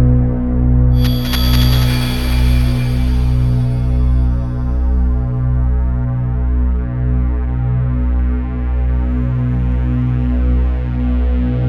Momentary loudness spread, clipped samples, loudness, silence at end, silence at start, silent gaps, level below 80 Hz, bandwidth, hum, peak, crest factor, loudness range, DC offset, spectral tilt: 5 LU; under 0.1%; -16 LUFS; 0 s; 0 s; none; -16 dBFS; 13.5 kHz; 60 Hz at -35 dBFS; 0 dBFS; 12 dB; 3 LU; under 0.1%; -7 dB/octave